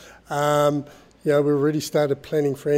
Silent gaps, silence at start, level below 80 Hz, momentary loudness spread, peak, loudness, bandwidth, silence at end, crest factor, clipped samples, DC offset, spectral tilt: none; 0 s; -60 dBFS; 9 LU; -6 dBFS; -22 LUFS; 16 kHz; 0 s; 16 dB; under 0.1%; under 0.1%; -6 dB/octave